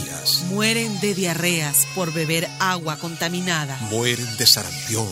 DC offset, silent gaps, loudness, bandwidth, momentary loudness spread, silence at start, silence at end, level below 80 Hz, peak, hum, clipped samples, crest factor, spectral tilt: under 0.1%; none; -20 LUFS; 16 kHz; 9 LU; 0 s; 0 s; -58 dBFS; -2 dBFS; none; under 0.1%; 20 dB; -2.5 dB/octave